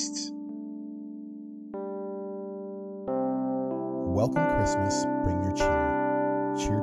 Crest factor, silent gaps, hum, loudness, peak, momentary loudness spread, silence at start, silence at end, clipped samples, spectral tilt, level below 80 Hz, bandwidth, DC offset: 14 dB; none; none; -29 LUFS; -14 dBFS; 14 LU; 0 s; 0 s; under 0.1%; -5.5 dB/octave; -46 dBFS; 12.5 kHz; under 0.1%